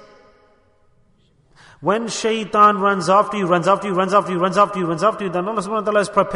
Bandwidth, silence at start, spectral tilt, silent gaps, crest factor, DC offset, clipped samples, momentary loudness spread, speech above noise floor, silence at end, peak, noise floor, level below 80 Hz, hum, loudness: 11 kHz; 1.8 s; -5 dB/octave; none; 18 dB; under 0.1%; under 0.1%; 8 LU; 40 dB; 0 s; -2 dBFS; -57 dBFS; -58 dBFS; none; -18 LUFS